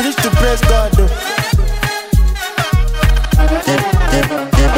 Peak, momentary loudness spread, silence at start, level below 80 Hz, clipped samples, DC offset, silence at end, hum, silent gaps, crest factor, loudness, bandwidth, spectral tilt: 0 dBFS; 4 LU; 0 s; -14 dBFS; under 0.1%; under 0.1%; 0 s; none; none; 12 dB; -14 LUFS; 16.5 kHz; -5 dB/octave